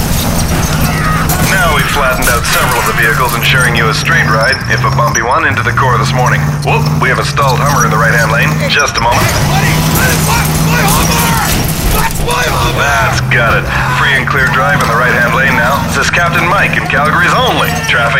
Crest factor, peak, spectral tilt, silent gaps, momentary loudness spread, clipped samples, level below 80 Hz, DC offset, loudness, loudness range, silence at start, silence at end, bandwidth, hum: 10 dB; 0 dBFS; -4 dB/octave; none; 3 LU; under 0.1%; -22 dBFS; under 0.1%; -9 LUFS; 1 LU; 0 s; 0 s; 16.5 kHz; none